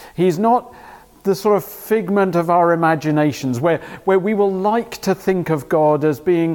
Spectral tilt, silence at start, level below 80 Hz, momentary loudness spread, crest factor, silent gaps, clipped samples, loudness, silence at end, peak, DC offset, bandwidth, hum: -7 dB/octave; 0 s; -56 dBFS; 6 LU; 14 dB; none; under 0.1%; -18 LUFS; 0 s; -4 dBFS; under 0.1%; 18 kHz; none